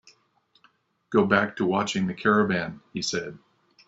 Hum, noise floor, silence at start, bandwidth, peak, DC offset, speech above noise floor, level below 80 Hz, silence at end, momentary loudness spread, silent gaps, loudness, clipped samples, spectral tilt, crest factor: none; -66 dBFS; 1.1 s; 8 kHz; -4 dBFS; under 0.1%; 42 dB; -64 dBFS; 0.5 s; 10 LU; none; -25 LUFS; under 0.1%; -5 dB/octave; 22 dB